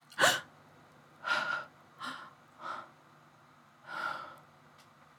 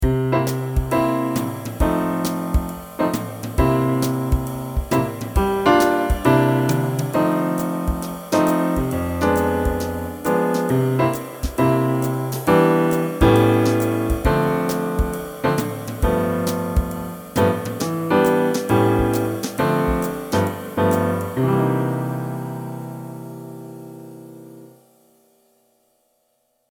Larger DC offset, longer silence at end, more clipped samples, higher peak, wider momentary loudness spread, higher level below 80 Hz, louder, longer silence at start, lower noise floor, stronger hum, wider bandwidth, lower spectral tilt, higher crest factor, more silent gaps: neither; second, 0.35 s vs 2.05 s; neither; second, -10 dBFS vs -2 dBFS; first, 27 LU vs 11 LU; second, -84 dBFS vs -30 dBFS; second, -35 LUFS vs -20 LUFS; about the same, 0.1 s vs 0 s; second, -61 dBFS vs -67 dBFS; neither; about the same, 19 kHz vs over 20 kHz; second, -1 dB/octave vs -6.5 dB/octave; first, 28 dB vs 18 dB; neither